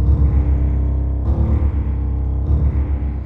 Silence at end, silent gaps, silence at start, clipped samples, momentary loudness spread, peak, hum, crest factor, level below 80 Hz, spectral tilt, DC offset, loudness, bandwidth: 0 s; none; 0 s; under 0.1%; 5 LU; -4 dBFS; none; 12 dB; -18 dBFS; -11.5 dB/octave; under 0.1%; -19 LUFS; 2.5 kHz